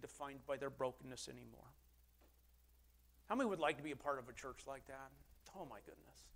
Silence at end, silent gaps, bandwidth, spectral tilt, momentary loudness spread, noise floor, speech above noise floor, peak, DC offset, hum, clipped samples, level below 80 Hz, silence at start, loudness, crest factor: 0 s; none; 16 kHz; -4.5 dB/octave; 21 LU; -71 dBFS; 24 dB; -24 dBFS; under 0.1%; none; under 0.1%; -70 dBFS; 0 s; -46 LUFS; 24 dB